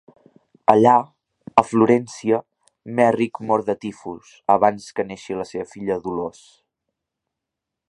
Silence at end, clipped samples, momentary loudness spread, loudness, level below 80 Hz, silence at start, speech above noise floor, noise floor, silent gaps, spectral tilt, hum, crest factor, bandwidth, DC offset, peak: 1.65 s; under 0.1%; 14 LU; -20 LUFS; -62 dBFS; 0.7 s; 64 dB; -84 dBFS; none; -6.5 dB/octave; none; 22 dB; 11.5 kHz; under 0.1%; 0 dBFS